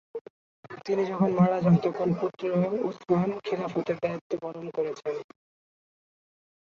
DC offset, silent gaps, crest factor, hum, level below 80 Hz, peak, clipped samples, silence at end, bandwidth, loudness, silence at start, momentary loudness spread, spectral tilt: under 0.1%; 0.21-0.63 s, 4.21-4.30 s; 20 dB; none; -68 dBFS; -10 dBFS; under 0.1%; 1.4 s; 7 kHz; -28 LUFS; 0.15 s; 12 LU; -9 dB/octave